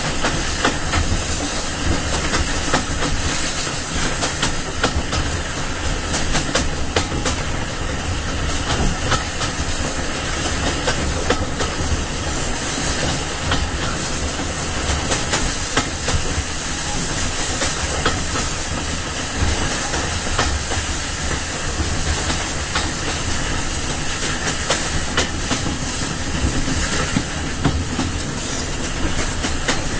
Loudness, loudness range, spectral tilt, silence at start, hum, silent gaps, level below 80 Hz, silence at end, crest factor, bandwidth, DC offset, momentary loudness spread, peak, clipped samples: -21 LUFS; 1 LU; -3 dB/octave; 0 s; none; none; -28 dBFS; 0 s; 20 dB; 8 kHz; 0.7%; 3 LU; -2 dBFS; under 0.1%